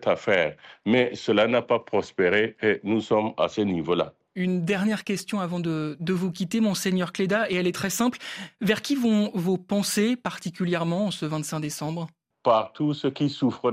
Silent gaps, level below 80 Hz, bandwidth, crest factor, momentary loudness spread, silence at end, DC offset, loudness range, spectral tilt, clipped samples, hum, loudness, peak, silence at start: none; -66 dBFS; 15 kHz; 16 dB; 7 LU; 0 s; under 0.1%; 3 LU; -5 dB/octave; under 0.1%; none; -25 LUFS; -8 dBFS; 0 s